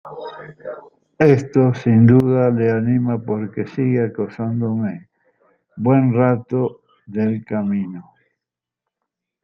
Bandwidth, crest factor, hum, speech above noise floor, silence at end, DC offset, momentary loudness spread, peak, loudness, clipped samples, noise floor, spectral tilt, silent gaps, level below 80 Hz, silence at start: 7 kHz; 16 dB; none; 68 dB; 1.4 s; under 0.1%; 20 LU; -2 dBFS; -18 LUFS; under 0.1%; -85 dBFS; -10 dB/octave; none; -58 dBFS; 0.05 s